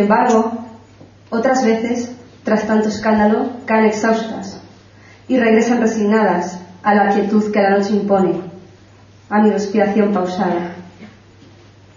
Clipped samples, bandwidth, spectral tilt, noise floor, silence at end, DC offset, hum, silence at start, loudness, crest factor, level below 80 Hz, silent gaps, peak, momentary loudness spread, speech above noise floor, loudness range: under 0.1%; 7.4 kHz; -6 dB/octave; -45 dBFS; 0.9 s; under 0.1%; none; 0 s; -16 LUFS; 16 dB; -56 dBFS; none; -2 dBFS; 13 LU; 30 dB; 3 LU